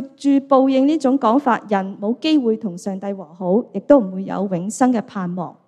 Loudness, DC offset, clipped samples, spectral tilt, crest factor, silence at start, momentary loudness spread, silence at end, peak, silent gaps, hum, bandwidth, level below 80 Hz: -18 LUFS; under 0.1%; under 0.1%; -6.5 dB/octave; 18 dB; 0 s; 11 LU; 0.15 s; 0 dBFS; none; none; 11 kHz; -62 dBFS